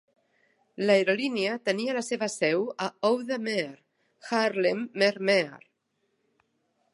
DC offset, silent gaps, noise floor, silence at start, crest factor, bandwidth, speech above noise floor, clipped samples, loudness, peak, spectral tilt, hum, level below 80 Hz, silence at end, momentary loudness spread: under 0.1%; none; -76 dBFS; 0.8 s; 20 dB; 11.5 kHz; 49 dB; under 0.1%; -27 LUFS; -8 dBFS; -4 dB/octave; none; -82 dBFS; 1.35 s; 8 LU